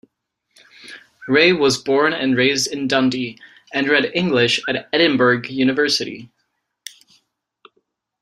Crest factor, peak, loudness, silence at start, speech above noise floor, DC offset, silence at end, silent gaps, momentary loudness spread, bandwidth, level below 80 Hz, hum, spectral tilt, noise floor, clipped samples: 18 dB; -2 dBFS; -17 LUFS; 0.85 s; 55 dB; under 0.1%; 1.95 s; none; 23 LU; 15.5 kHz; -62 dBFS; none; -4 dB/octave; -73 dBFS; under 0.1%